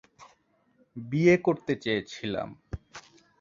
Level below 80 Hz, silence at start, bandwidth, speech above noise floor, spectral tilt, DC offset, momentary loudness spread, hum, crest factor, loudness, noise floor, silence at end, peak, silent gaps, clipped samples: -54 dBFS; 0.2 s; 7.4 kHz; 41 dB; -6.5 dB/octave; under 0.1%; 24 LU; none; 22 dB; -27 LUFS; -67 dBFS; 0.4 s; -8 dBFS; none; under 0.1%